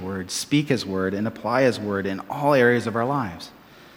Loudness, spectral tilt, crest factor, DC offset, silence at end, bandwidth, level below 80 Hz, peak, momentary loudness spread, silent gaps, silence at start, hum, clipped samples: -23 LUFS; -5 dB/octave; 18 dB; under 0.1%; 0.1 s; 18 kHz; -62 dBFS; -4 dBFS; 10 LU; none; 0 s; none; under 0.1%